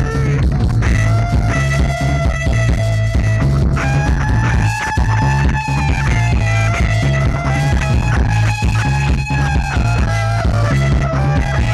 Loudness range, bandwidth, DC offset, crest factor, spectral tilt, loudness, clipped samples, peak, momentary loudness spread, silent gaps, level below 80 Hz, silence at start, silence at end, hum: 0 LU; 12 kHz; under 0.1%; 12 dB; -6.5 dB/octave; -15 LUFS; under 0.1%; -2 dBFS; 2 LU; none; -20 dBFS; 0 s; 0 s; none